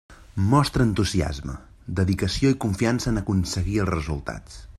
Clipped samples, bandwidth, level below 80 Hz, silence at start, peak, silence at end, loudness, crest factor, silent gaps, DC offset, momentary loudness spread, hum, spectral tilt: under 0.1%; 13.5 kHz; -38 dBFS; 0.1 s; -6 dBFS; 0 s; -24 LUFS; 18 dB; none; under 0.1%; 14 LU; none; -6 dB/octave